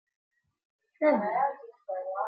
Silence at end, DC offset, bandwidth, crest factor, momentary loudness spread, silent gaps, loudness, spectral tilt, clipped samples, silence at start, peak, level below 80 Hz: 0 s; under 0.1%; 4.9 kHz; 18 dB; 13 LU; none; -29 LUFS; -9.5 dB/octave; under 0.1%; 1 s; -14 dBFS; -80 dBFS